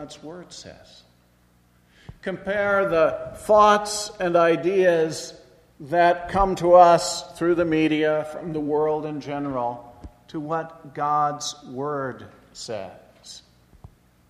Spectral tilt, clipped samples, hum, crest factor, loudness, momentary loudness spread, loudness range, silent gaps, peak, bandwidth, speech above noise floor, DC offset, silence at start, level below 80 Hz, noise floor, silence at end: -4.5 dB/octave; under 0.1%; 60 Hz at -60 dBFS; 22 dB; -21 LUFS; 22 LU; 9 LU; none; -2 dBFS; 13 kHz; 38 dB; under 0.1%; 0 s; -48 dBFS; -59 dBFS; 0.9 s